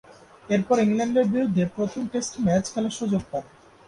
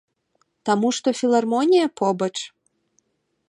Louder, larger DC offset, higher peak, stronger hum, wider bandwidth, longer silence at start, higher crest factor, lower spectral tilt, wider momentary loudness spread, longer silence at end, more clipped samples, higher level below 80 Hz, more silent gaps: second, -24 LUFS vs -21 LUFS; neither; about the same, -8 dBFS vs -6 dBFS; neither; about the same, 11 kHz vs 11 kHz; second, 0.1 s vs 0.65 s; about the same, 16 dB vs 16 dB; first, -6 dB/octave vs -4.5 dB/octave; second, 7 LU vs 12 LU; second, 0.45 s vs 1 s; neither; first, -56 dBFS vs -76 dBFS; neither